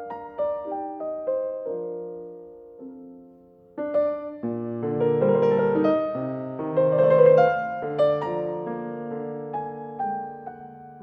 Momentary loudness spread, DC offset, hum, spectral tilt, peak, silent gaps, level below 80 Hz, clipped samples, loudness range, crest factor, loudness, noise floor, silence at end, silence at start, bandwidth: 22 LU; under 0.1%; none; -9.5 dB/octave; -6 dBFS; none; -66 dBFS; under 0.1%; 11 LU; 20 dB; -24 LUFS; -52 dBFS; 0 s; 0 s; 5.6 kHz